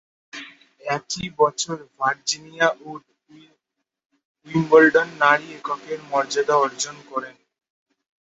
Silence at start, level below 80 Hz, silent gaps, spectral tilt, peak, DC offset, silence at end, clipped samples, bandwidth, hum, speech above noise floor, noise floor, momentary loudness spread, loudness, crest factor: 0.35 s; -64 dBFS; 4.06-4.10 s, 4.25-4.35 s; -3.5 dB/octave; 0 dBFS; under 0.1%; 0.95 s; under 0.1%; 8 kHz; none; 60 dB; -81 dBFS; 21 LU; -21 LUFS; 22 dB